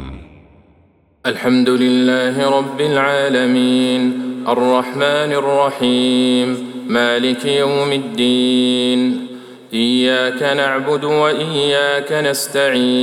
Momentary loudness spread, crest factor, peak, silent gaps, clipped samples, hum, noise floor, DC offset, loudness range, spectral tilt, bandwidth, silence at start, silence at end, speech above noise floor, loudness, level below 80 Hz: 6 LU; 14 dB; -2 dBFS; none; under 0.1%; none; -53 dBFS; under 0.1%; 1 LU; -4.5 dB/octave; 16 kHz; 0 s; 0 s; 38 dB; -15 LUFS; -50 dBFS